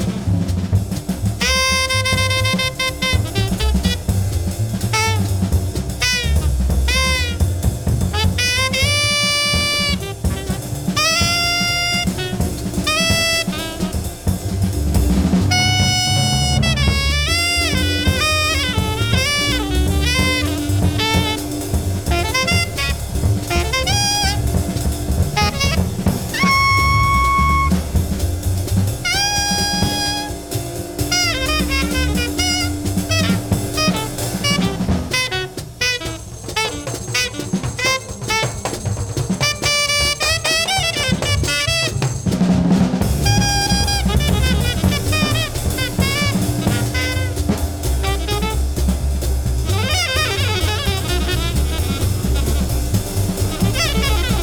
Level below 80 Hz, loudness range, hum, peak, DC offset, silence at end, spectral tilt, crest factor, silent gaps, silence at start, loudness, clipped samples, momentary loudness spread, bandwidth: -24 dBFS; 3 LU; none; -2 dBFS; under 0.1%; 0 s; -4 dB/octave; 16 dB; none; 0 s; -17 LUFS; under 0.1%; 7 LU; over 20 kHz